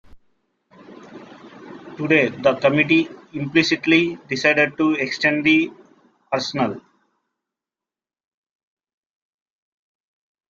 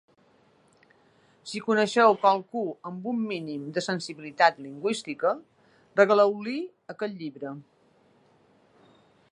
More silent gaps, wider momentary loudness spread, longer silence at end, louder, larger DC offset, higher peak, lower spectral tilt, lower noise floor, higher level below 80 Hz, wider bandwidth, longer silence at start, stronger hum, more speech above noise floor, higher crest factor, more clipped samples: neither; second, 13 LU vs 17 LU; first, 3.7 s vs 1.7 s; first, -19 LUFS vs -26 LUFS; neither; about the same, -2 dBFS vs -4 dBFS; about the same, -5 dB/octave vs -4.5 dB/octave; first, under -90 dBFS vs -62 dBFS; first, -62 dBFS vs -82 dBFS; second, 7.4 kHz vs 11.5 kHz; second, 0.15 s vs 1.45 s; neither; first, over 71 dB vs 37 dB; about the same, 22 dB vs 24 dB; neither